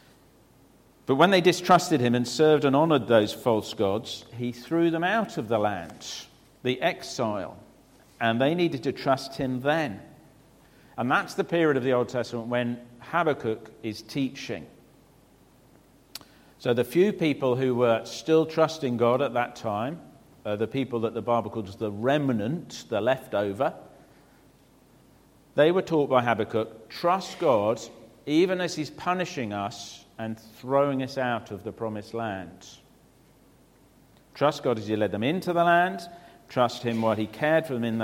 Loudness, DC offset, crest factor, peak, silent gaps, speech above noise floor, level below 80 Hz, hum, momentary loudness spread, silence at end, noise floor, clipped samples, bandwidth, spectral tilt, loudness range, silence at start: -26 LUFS; under 0.1%; 22 dB; -6 dBFS; none; 32 dB; -64 dBFS; none; 15 LU; 0 s; -58 dBFS; under 0.1%; 16.5 kHz; -5.5 dB/octave; 7 LU; 1.1 s